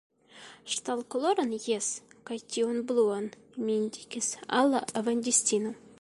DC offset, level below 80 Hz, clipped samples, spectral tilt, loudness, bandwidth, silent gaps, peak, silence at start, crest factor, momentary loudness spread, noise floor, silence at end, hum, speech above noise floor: under 0.1%; -74 dBFS; under 0.1%; -2.5 dB/octave; -29 LUFS; 11.5 kHz; none; -10 dBFS; 0.35 s; 20 dB; 14 LU; -52 dBFS; 0.25 s; none; 23 dB